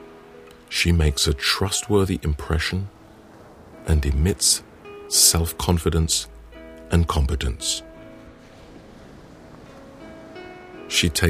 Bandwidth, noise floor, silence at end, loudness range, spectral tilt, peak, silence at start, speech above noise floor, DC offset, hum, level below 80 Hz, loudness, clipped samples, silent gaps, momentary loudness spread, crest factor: 15.5 kHz; -46 dBFS; 0 s; 10 LU; -3.5 dB/octave; 0 dBFS; 0 s; 26 dB; under 0.1%; none; -30 dBFS; -21 LUFS; under 0.1%; none; 23 LU; 22 dB